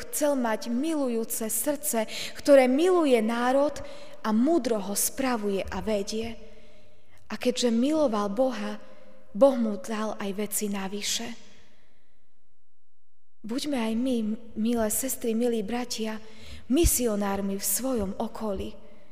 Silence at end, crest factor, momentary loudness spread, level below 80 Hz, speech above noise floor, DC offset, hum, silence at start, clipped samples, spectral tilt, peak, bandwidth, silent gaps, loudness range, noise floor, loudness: 0.35 s; 20 dB; 13 LU; -46 dBFS; 58 dB; 1%; none; 0 s; under 0.1%; -4 dB/octave; -8 dBFS; 16 kHz; none; 9 LU; -84 dBFS; -27 LUFS